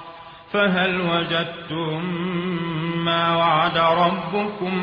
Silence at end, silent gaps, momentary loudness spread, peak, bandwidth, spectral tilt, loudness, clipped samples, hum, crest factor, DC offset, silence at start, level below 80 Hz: 0 s; none; 9 LU; -4 dBFS; 5.4 kHz; -8 dB/octave; -21 LUFS; under 0.1%; none; 16 dB; under 0.1%; 0 s; -56 dBFS